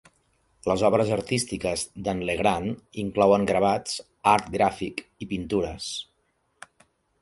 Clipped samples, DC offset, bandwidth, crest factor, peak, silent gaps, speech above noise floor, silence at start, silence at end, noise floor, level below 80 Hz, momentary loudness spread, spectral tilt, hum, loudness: under 0.1%; under 0.1%; 11.5 kHz; 22 dB; -4 dBFS; none; 46 dB; 0.65 s; 1.2 s; -71 dBFS; -50 dBFS; 12 LU; -5 dB/octave; none; -25 LUFS